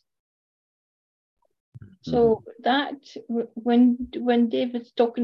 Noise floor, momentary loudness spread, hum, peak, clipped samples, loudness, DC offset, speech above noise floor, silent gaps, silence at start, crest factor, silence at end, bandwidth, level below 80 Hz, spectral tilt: under -90 dBFS; 11 LU; none; -8 dBFS; under 0.1%; -23 LUFS; under 0.1%; over 67 dB; none; 1.75 s; 16 dB; 0 s; 6 kHz; -56 dBFS; -7 dB/octave